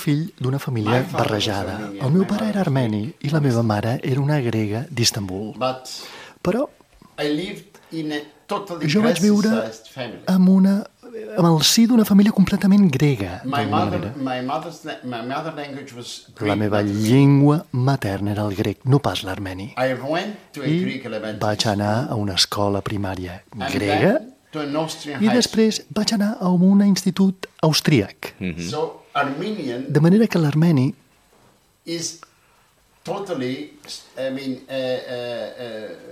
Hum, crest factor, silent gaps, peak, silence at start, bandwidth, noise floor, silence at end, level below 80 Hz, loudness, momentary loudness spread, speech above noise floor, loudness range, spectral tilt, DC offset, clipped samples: none; 16 dB; none; -4 dBFS; 0 s; 16 kHz; -58 dBFS; 0 s; -56 dBFS; -20 LUFS; 16 LU; 38 dB; 9 LU; -5.5 dB/octave; under 0.1%; under 0.1%